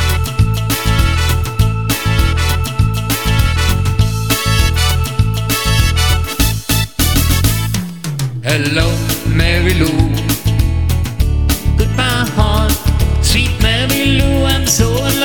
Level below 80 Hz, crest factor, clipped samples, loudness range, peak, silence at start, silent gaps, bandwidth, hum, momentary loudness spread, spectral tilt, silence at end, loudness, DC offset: -18 dBFS; 12 dB; under 0.1%; 1 LU; 0 dBFS; 0 s; none; 19.5 kHz; none; 4 LU; -4.5 dB/octave; 0 s; -14 LUFS; 2%